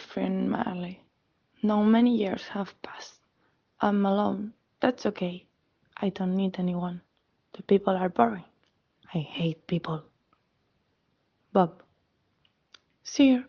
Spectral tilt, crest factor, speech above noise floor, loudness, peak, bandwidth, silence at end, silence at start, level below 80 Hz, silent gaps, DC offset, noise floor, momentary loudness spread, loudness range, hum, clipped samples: -7 dB/octave; 24 dB; 47 dB; -28 LUFS; -6 dBFS; 6.8 kHz; 0.05 s; 0 s; -68 dBFS; none; under 0.1%; -73 dBFS; 18 LU; 6 LU; none; under 0.1%